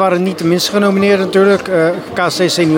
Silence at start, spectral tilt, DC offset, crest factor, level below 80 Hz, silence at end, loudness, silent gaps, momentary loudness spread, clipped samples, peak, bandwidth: 0 s; -5 dB/octave; under 0.1%; 12 dB; -54 dBFS; 0 s; -13 LUFS; none; 4 LU; under 0.1%; 0 dBFS; 17 kHz